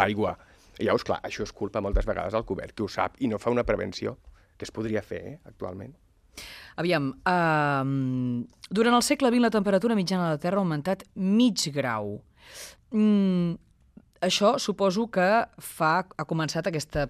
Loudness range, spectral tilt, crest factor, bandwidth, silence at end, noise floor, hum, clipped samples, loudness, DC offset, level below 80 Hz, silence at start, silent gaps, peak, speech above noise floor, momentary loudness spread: 7 LU; -5.5 dB/octave; 22 dB; 14.5 kHz; 0 s; -56 dBFS; none; under 0.1%; -26 LUFS; under 0.1%; -44 dBFS; 0 s; none; -4 dBFS; 30 dB; 17 LU